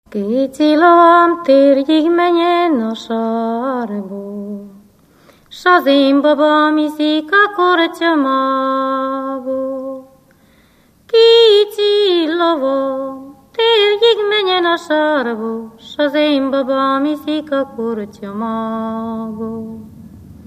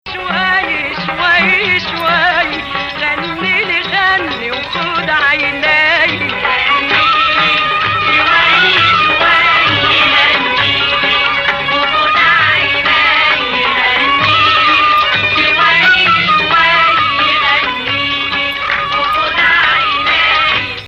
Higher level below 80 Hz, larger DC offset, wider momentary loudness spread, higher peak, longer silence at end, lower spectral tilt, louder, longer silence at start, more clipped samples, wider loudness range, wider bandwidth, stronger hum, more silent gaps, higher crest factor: second, -58 dBFS vs -40 dBFS; neither; first, 15 LU vs 7 LU; about the same, 0 dBFS vs 0 dBFS; first, 0.15 s vs 0 s; first, -5 dB/octave vs -3.5 dB/octave; second, -14 LUFS vs -10 LUFS; about the same, 0.1 s vs 0.05 s; neither; first, 7 LU vs 4 LU; about the same, 15 kHz vs 15 kHz; neither; neither; about the same, 14 dB vs 12 dB